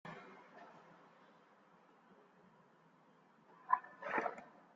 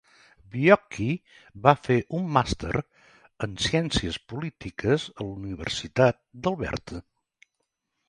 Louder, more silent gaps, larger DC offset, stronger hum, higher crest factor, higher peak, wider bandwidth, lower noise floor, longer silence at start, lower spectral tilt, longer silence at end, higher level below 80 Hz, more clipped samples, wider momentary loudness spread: second, -41 LUFS vs -26 LUFS; neither; neither; neither; about the same, 30 dB vs 26 dB; second, -18 dBFS vs -2 dBFS; second, 7.6 kHz vs 11.5 kHz; second, -69 dBFS vs -80 dBFS; second, 0.05 s vs 0.55 s; second, -3 dB/octave vs -5.5 dB/octave; second, 0.15 s vs 1.05 s; second, under -90 dBFS vs -46 dBFS; neither; first, 27 LU vs 14 LU